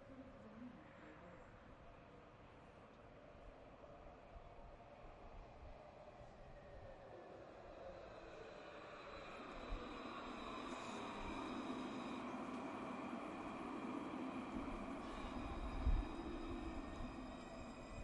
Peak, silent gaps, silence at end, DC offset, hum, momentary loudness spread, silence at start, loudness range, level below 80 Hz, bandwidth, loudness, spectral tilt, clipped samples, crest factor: -28 dBFS; none; 0 s; under 0.1%; none; 13 LU; 0 s; 13 LU; -56 dBFS; 11 kHz; -51 LUFS; -6 dB/octave; under 0.1%; 22 dB